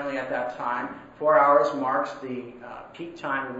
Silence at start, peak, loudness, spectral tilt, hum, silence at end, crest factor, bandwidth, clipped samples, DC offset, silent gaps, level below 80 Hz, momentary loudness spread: 0 s; -8 dBFS; -24 LUFS; -6 dB/octave; none; 0 s; 18 dB; 7.8 kHz; under 0.1%; under 0.1%; none; -64 dBFS; 20 LU